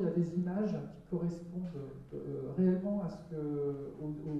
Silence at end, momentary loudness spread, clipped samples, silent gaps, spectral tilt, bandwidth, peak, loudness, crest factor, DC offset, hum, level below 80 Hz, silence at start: 0 s; 11 LU; under 0.1%; none; -10 dB/octave; 7.8 kHz; -20 dBFS; -37 LUFS; 16 dB; under 0.1%; none; -62 dBFS; 0 s